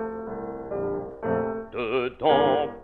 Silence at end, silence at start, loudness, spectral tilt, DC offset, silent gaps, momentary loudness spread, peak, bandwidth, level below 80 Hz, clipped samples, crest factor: 0 s; 0 s; -26 LUFS; -8.5 dB/octave; under 0.1%; none; 12 LU; -8 dBFS; 4.3 kHz; -54 dBFS; under 0.1%; 18 dB